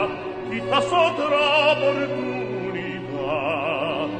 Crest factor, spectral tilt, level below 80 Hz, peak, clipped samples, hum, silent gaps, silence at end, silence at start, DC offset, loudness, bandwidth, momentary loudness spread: 16 dB; -5 dB/octave; -56 dBFS; -6 dBFS; under 0.1%; none; none; 0 s; 0 s; under 0.1%; -22 LUFS; 9.4 kHz; 11 LU